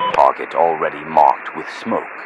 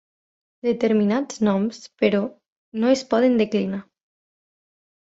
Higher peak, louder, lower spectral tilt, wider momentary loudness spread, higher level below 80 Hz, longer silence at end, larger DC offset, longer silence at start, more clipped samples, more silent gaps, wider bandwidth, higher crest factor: first, 0 dBFS vs -4 dBFS; first, -17 LUFS vs -22 LUFS; about the same, -5 dB/octave vs -6 dB/octave; about the same, 11 LU vs 10 LU; first, -58 dBFS vs -66 dBFS; second, 0 s vs 1.25 s; neither; second, 0 s vs 0.65 s; first, 0.2% vs under 0.1%; second, none vs 2.48-2.72 s; first, 10.5 kHz vs 8 kHz; about the same, 18 dB vs 18 dB